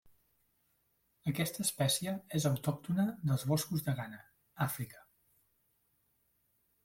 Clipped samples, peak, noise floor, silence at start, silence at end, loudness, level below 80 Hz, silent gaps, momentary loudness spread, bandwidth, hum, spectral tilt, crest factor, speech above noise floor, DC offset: under 0.1%; -18 dBFS; -77 dBFS; 1.25 s; 1.85 s; -35 LUFS; -68 dBFS; none; 9 LU; 16.5 kHz; none; -5 dB/octave; 20 dB; 42 dB; under 0.1%